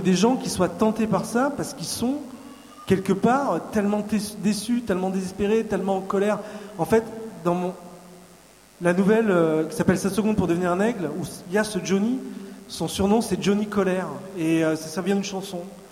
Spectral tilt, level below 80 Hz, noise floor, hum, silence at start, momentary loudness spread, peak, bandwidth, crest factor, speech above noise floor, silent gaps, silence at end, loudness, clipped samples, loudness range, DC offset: -5.5 dB/octave; -52 dBFS; -51 dBFS; none; 0 s; 11 LU; -6 dBFS; 16 kHz; 16 dB; 28 dB; none; 0 s; -24 LUFS; under 0.1%; 2 LU; under 0.1%